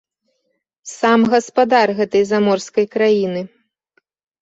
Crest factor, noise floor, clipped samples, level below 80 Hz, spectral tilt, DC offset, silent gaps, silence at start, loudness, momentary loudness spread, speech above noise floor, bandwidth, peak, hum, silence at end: 16 dB; -70 dBFS; under 0.1%; -62 dBFS; -5 dB/octave; under 0.1%; none; 0.85 s; -16 LUFS; 14 LU; 55 dB; 8 kHz; -2 dBFS; none; 0.95 s